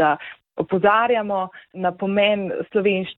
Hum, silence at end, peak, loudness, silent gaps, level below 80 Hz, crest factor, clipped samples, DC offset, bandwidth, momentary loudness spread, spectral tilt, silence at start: none; 0.05 s; -6 dBFS; -21 LUFS; none; -60 dBFS; 16 dB; under 0.1%; under 0.1%; 4.1 kHz; 11 LU; -9 dB/octave; 0 s